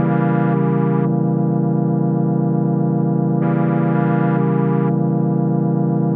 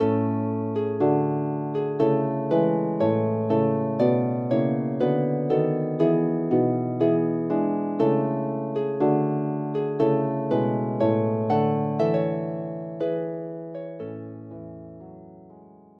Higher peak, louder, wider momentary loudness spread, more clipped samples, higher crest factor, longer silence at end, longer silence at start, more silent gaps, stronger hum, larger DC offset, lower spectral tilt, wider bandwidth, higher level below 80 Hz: first, -4 dBFS vs -8 dBFS; first, -17 LUFS vs -24 LUFS; second, 1 LU vs 13 LU; neither; about the same, 12 dB vs 14 dB; second, 0 s vs 0.4 s; about the same, 0 s vs 0 s; neither; neither; neither; first, -14 dB/octave vs -11 dB/octave; second, 3.4 kHz vs 5.6 kHz; second, -76 dBFS vs -70 dBFS